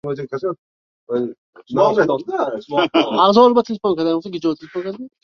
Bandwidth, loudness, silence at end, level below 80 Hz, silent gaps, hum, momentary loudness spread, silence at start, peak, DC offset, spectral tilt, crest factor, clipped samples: 6.8 kHz; -18 LUFS; 0.15 s; -62 dBFS; 0.58-1.07 s, 1.38-1.53 s; none; 14 LU; 0.05 s; -2 dBFS; under 0.1%; -6.5 dB/octave; 18 dB; under 0.1%